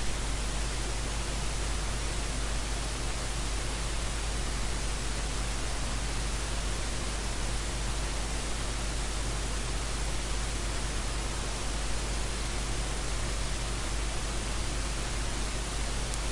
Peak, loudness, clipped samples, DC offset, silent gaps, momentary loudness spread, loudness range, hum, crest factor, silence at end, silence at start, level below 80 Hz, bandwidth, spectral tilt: -14 dBFS; -34 LUFS; under 0.1%; under 0.1%; none; 0 LU; 0 LU; none; 18 dB; 0 s; 0 s; -34 dBFS; 11.5 kHz; -3 dB/octave